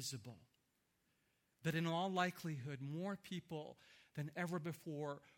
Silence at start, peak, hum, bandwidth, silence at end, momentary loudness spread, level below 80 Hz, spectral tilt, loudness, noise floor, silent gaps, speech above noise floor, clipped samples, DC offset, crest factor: 0 s; -24 dBFS; none; 17.5 kHz; 0.05 s; 15 LU; -84 dBFS; -5.5 dB/octave; -45 LUFS; -83 dBFS; none; 38 dB; under 0.1%; under 0.1%; 22 dB